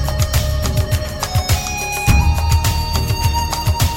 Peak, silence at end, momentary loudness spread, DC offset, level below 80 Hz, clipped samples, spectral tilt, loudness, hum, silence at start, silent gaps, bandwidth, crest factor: -2 dBFS; 0 s; 5 LU; under 0.1%; -20 dBFS; under 0.1%; -4 dB/octave; -17 LUFS; none; 0 s; none; 17 kHz; 14 dB